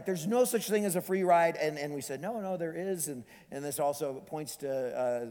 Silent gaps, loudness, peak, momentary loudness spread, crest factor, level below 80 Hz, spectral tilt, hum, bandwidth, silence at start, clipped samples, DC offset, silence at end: none; -32 LUFS; -14 dBFS; 12 LU; 18 dB; -74 dBFS; -4.5 dB/octave; none; 19.5 kHz; 0 s; under 0.1%; under 0.1%; 0 s